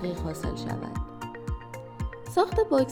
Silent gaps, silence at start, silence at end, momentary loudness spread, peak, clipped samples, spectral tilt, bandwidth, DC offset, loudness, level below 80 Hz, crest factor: none; 0 s; 0 s; 14 LU; -10 dBFS; under 0.1%; -6.5 dB/octave; 17 kHz; under 0.1%; -30 LUFS; -40 dBFS; 20 dB